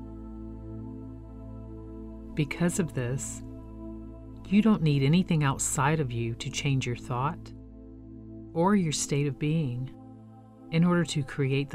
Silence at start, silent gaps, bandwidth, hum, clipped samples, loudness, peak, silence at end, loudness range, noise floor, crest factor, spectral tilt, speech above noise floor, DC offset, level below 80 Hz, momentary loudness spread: 0 s; none; 15 kHz; none; under 0.1%; -28 LUFS; -12 dBFS; 0 s; 7 LU; -49 dBFS; 16 dB; -5.5 dB/octave; 23 dB; under 0.1%; -48 dBFS; 20 LU